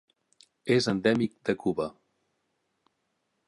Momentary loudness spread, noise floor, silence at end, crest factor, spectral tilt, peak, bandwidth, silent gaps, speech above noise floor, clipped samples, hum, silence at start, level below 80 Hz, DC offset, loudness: 10 LU; -78 dBFS; 1.55 s; 20 dB; -5.5 dB/octave; -10 dBFS; 11.5 kHz; none; 51 dB; under 0.1%; none; 0.65 s; -66 dBFS; under 0.1%; -28 LUFS